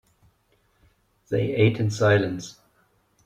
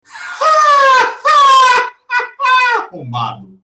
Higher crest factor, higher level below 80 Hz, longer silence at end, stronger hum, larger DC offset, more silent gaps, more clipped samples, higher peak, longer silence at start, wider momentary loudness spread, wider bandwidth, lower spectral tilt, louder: first, 20 dB vs 8 dB; about the same, -58 dBFS vs -62 dBFS; first, 0.75 s vs 0.2 s; neither; neither; neither; neither; about the same, -6 dBFS vs -4 dBFS; first, 1.3 s vs 0.15 s; about the same, 13 LU vs 14 LU; about the same, 9 kHz vs 9.6 kHz; first, -6.5 dB/octave vs -2 dB/octave; second, -23 LUFS vs -10 LUFS